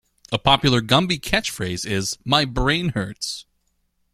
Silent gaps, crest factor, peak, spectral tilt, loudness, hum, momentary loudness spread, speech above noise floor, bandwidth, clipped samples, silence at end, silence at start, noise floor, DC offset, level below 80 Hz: none; 22 dB; 0 dBFS; -4 dB/octave; -20 LUFS; none; 11 LU; 48 dB; 15.5 kHz; under 0.1%; 0.7 s; 0.3 s; -68 dBFS; under 0.1%; -38 dBFS